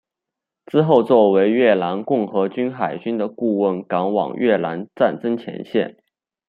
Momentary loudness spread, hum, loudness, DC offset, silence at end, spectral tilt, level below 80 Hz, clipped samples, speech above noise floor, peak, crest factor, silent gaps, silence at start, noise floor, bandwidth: 10 LU; none; -19 LUFS; under 0.1%; 0.55 s; -9 dB/octave; -66 dBFS; under 0.1%; 66 dB; -2 dBFS; 18 dB; none; 0.75 s; -85 dBFS; 4.9 kHz